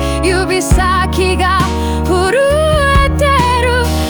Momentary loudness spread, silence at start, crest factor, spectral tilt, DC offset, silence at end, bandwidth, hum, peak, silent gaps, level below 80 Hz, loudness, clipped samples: 3 LU; 0 s; 10 dB; -5 dB/octave; under 0.1%; 0 s; over 20 kHz; none; 0 dBFS; none; -20 dBFS; -12 LUFS; under 0.1%